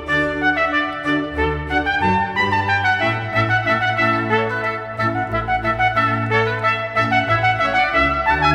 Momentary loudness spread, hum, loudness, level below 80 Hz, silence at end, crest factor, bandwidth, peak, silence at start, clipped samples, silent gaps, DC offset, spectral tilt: 5 LU; none; -18 LUFS; -38 dBFS; 0 s; 14 dB; 10.5 kHz; -4 dBFS; 0 s; under 0.1%; none; under 0.1%; -6 dB/octave